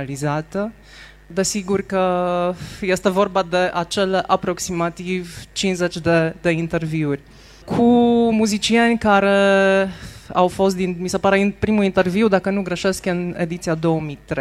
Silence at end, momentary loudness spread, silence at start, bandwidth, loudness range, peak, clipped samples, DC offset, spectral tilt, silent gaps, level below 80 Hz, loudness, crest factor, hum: 0 s; 10 LU; 0 s; 14.5 kHz; 5 LU; -2 dBFS; under 0.1%; under 0.1%; -5 dB/octave; none; -46 dBFS; -19 LUFS; 18 dB; none